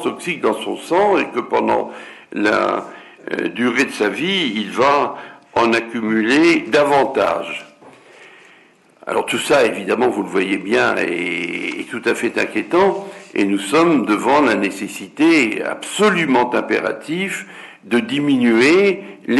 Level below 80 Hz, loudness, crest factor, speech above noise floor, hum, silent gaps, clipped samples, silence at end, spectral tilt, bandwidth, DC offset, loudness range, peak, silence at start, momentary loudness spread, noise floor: -60 dBFS; -17 LUFS; 12 dB; 33 dB; none; none; under 0.1%; 0 s; -4.5 dB/octave; 12 kHz; under 0.1%; 3 LU; -6 dBFS; 0 s; 12 LU; -50 dBFS